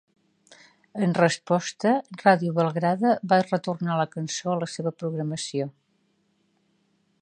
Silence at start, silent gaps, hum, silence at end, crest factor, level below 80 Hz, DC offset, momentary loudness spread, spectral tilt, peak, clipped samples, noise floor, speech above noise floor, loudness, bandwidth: 0.5 s; none; none; 1.5 s; 22 dB; -74 dBFS; under 0.1%; 9 LU; -5.5 dB/octave; -4 dBFS; under 0.1%; -69 dBFS; 45 dB; -25 LUFS; 9.8 kHz